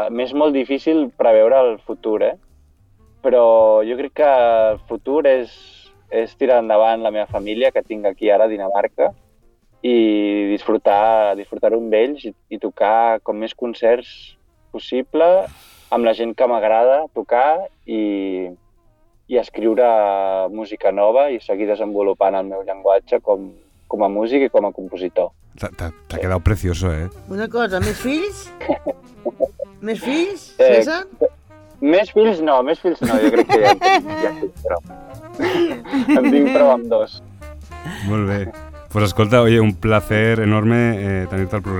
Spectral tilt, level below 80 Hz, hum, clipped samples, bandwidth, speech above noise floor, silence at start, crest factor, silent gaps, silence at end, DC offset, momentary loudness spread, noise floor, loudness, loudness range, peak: -7 dB/octave; -40 dBFS; none; under 0.1%; 18 kHz; 38 dB; 0 s; 18 dB; none; 0 s; under 0.1%; 14 LU; -55 dBFS; -17 LUFS; 5 LU; 0 dBFS